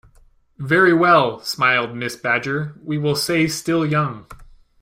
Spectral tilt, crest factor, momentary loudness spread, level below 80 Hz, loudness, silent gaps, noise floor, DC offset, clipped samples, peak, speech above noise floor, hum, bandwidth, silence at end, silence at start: -5 dB/octave; 18 dB; 12 LU; -52 dBFS; -18 LUFS; none; -53 dBFS; under 0.1%; under 0.1%; -2 dBFS; 34 dB; none; 16 kHz; 0.4 s; 0.6 s